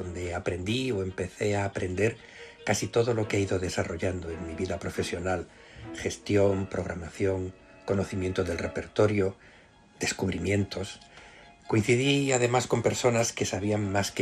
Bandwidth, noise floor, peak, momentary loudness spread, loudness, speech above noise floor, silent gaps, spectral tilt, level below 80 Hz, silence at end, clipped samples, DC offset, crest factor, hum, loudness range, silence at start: 13.5 kHz; -55 dBFS; -10 dBFS; 11 LU; -29 LUFS; 27 dB; none; -5 dB/octave; -54 dBFS; 0 s; under 0.1%; under 0.1%; 18 dB; none; 4 LU; 0 s